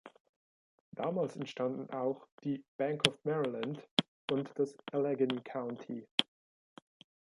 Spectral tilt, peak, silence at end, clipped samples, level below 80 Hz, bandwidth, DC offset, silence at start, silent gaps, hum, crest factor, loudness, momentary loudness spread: -5 dB/octave; -6 dBFS; 1.15 s; under 0.1%; -82 dBFS; 11 kHz; under 0.1%; 0.05 s; 0.20-0.92 s, 2.32-2.38 s, 2.68-2.79 s, 3.91-3.97 s, 4.08-4.28 s, 6.11-6.18 s; none; 32 dB; -36 LUFS; 10 LU